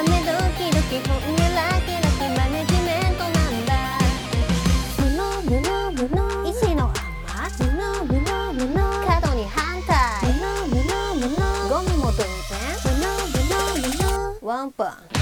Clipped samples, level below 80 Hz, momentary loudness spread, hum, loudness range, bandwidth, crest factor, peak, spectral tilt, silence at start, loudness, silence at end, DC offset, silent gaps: under 0.1%; -26 dBFS; 5 LU; none; 2 LU; over 20 kHz; 16 dB; -6 dBFS; -5 dB/octave; 0 s; -22 LUFS; 0 s; under 0.1%; none